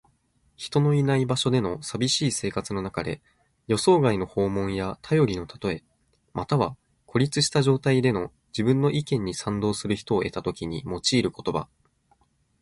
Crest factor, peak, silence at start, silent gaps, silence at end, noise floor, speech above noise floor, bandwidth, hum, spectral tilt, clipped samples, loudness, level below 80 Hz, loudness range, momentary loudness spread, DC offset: 18 dB; -6 dBFS; 0.6 s; none; 0.95 s; -66 dBFS; 42 dB; 11.5 kHz; none; -5.5 dB/octave; under 0.1%; -25 LUFS; -52 dBFS; 3 LU; 10 LU; under 0.1%